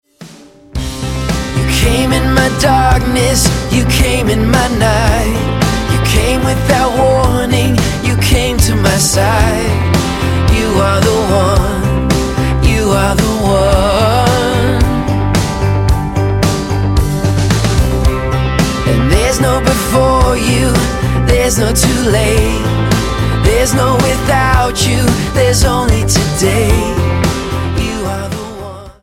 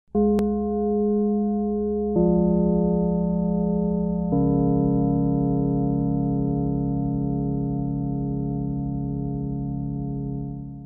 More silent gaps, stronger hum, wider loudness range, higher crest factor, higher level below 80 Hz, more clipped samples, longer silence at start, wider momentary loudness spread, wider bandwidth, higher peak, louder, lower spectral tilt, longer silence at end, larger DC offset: neither; neither; second, 2 LU vs 5 LU; about the same, 12 dB vs 14 dB; first, -18 dBFS vs -38 dBFS; neither; about the same, 0.2 s vs 0.15 s; second, 4 LU vs 8 LU; first, 17 kHz vs 1.8 kHz; first, 0 dBFS vs -10 dBFS; first, -12 LUFS vs -24 LUFS; second, -5 dB/octave vs -13 dB/octave; about the same, 0.1 s vs 0 s; neither